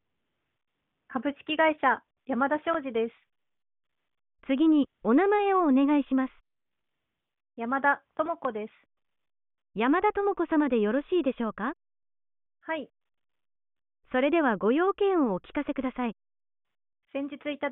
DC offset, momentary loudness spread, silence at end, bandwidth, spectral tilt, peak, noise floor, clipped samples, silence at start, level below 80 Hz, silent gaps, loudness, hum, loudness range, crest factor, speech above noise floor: under 0.1%; 12 LU; 0 s; 4 kHz; -3.5 dB/octave; -10 dBFS; -90 dBFS; under 0.1%; 1.1 s; -64 dBFS; none; -27 LUFS; none; 6 LU; 18 dB; 63 dB